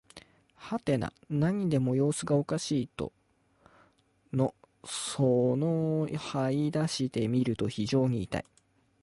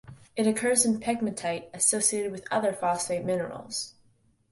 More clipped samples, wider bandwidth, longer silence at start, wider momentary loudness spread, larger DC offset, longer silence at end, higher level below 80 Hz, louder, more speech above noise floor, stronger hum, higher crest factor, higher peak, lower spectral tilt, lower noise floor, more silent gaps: neither; about the same, 11.5 kHz vs 12 kHz; about the same, 0.15 s vs 0.05 s; about the same, 10 LU vs 11 LU; neither; about the same, 0.6 s vs 0.6 s; first, -60 dBFS vs -66 dBFS; second, -30 LUFS vs -27 LUFS; about the same, 39 dB vs 38 dB; neither; about the same, 16 dB vs 20 dB; second, -14 dBFS vs -10 dBFS; first, -6.5 dB/octave vs -3 dB/octave; about the same, -68 dBFS vs -65 dBFS; neither